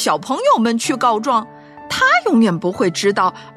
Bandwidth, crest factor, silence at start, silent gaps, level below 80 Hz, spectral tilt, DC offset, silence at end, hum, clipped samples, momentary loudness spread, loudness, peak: 13.5 kHz; 14 dB; 0 s; none; -58 dBFS; -4 dB/octave; under 0.1%; 0.05 s; none; under 0.1%; 6 LU; -16 LUFS; -4 dBFS